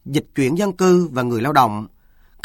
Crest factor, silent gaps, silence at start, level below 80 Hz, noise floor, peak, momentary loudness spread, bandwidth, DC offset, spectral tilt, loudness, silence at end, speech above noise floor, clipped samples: 18 dB; none; 0.05 s; -52 dBFS; -50 dBFS; 0 dBFS; 9 LU; 16.5 kHz; under 0.1%; -6 dB/octave; -18 LUFS; 0.55 s; 33 dB; under 0.1%